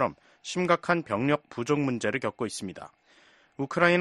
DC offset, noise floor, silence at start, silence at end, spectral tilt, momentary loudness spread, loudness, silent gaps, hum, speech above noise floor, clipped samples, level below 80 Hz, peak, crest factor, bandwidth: under 0.1%; -60 dBFS; 0 s; 0 s; -5.5 dB/octave; 15 LU; -28 LUFS; none; none; 32 dB; under 0.1%; -64 dBFS; -6 dBFS; 22 dB; 11.5 kHz